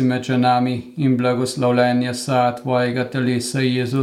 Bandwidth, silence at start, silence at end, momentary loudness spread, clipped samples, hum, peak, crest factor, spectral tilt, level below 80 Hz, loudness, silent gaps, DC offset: 14 kHz; 0 s; 0 s; 4 LU; under 0.1%; none; -4 dBFS; 14 dB; -6 dB/octave; -62 dBFS; -19 LUFS; none; under 0.1%